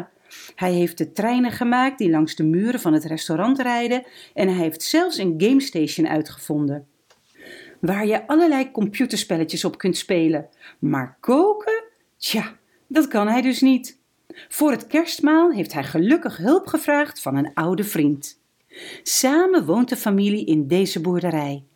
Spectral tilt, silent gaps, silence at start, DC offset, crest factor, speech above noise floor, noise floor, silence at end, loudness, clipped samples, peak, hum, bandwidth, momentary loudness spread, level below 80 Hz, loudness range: -5 dB/octave; none; 0 s; under 0.1%; 16 dB; 35 dB; -55 dBFS; 0.15 s; -20 LUFS; under 0.1%; -6 dBFS; none; 19 kHz; 9 LU; -68 dBFS; 3 LU